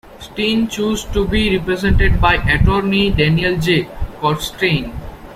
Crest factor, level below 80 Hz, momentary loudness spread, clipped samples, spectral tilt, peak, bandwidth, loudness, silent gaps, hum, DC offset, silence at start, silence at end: 14 dB; -24 dBFS; 7 LU; under 0.1%; -5.5 dB/octave; 0 dBFS; 16 kHz; -16 LUFS; none; none; under 0.1%; 0.05 s; 0 s